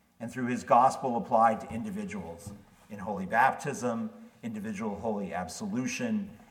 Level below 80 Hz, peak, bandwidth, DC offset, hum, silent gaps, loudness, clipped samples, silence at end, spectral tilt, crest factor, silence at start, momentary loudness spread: -66 dBFS; -10 dBFS; 16.5 kHz; under 0.1%; none; none; -30 LUFS; under 0.1%; 0.05 s; -5.5 dB/octave; 20 dB; 0.2 s; 16 LU